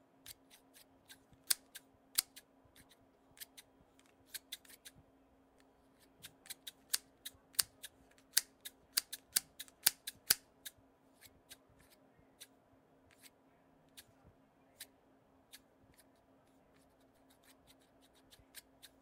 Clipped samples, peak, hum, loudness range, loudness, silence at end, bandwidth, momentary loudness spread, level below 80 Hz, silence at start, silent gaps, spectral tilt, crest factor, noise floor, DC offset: under 0.1%; -8 dBFS; none; 25 LU; -38 LUFS; 0.4 s; 16 kHz; 27 LU; -80 dBFS; 0.3 s; none; 1.5 dB/octave; 38 dB; -69 dBFS; under 0.1%